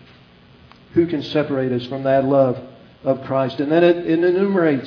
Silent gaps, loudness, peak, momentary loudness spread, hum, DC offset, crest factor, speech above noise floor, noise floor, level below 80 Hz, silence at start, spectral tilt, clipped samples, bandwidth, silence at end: none; -19 LUFS; -4 dBFS; 8 LU; none; under 0.1%; 16 dB; 30 dB; -48 dBFS; -56 dBFS; 0.95 s; -9 dB/octave; under 0.1%; 5.4 kHz; 0 s